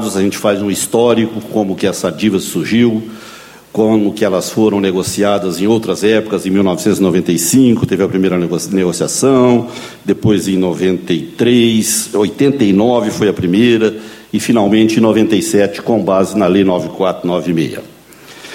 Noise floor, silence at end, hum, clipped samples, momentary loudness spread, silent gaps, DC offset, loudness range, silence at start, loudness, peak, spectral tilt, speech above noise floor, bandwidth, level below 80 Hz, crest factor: -37 dBFS; 0 s; none; under 0.1%; 7 LU; none; under 0.1%; 2 LU; 0 s; -13 LUFS; 0 dBFS; -5 dB/octave; 25 dB; 16.5 kHz; -50 dBFS; 12 dB